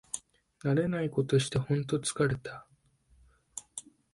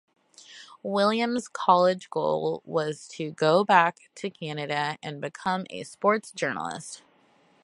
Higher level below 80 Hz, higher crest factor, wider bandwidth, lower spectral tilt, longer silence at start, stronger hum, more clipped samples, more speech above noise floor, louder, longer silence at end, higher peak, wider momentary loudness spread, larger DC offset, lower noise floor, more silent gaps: first, -60 dBFS vs -74 dBFS; second, 18 dB vs 24 dB; about the same, 11.5 kHz vs 11.5 kHz; about the same, -5.5 dB/octave vs -5 dB/octave; second, 0.15 s vs 0.5 s; neither; neither; about the same, 36 dB vs 36 dB; second, -31 LUFS vs -26 LUFS; second, 0.35 s vs 0.65 s; second, -14 dBFS vs -4 dBFS; about the same, 17 LU vs 17 LU; neither; first, -66 dBFS vs -62 dBFS; neither